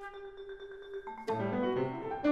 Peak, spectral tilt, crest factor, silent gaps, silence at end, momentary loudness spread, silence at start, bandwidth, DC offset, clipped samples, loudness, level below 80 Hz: -18 dBFS; -7.5 dB/octave; 18 dB; none; 0 s; 14 LU; 0 s; 9.8 kHz; under 0.1%; under 0.1%; -37 LUFS; -62 dBFS